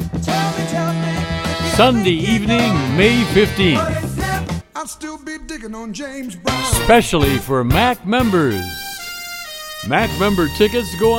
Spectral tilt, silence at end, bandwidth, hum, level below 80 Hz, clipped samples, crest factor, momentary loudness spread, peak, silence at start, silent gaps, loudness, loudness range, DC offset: -5 dB/octave; 0 s; 17 kHz; none; -32 dBFS; under 0.1%; 16 dB; 15 LU; 0 dBFS; 0 s; none; -17 LUFS; 4 LU; under 0.1%